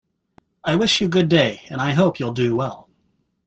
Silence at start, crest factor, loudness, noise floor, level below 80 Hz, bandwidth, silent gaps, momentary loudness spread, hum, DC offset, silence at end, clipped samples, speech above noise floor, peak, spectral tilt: 0.65 s; 18 dB; -19 LUFS; -67 dBFS; -54 dBFS; 8.4 kHz; none; 8 LU; none; under 0.1%; 0.65 s; under 0.1%; 48 dB; -4 dBFS; -5.5 dB/octave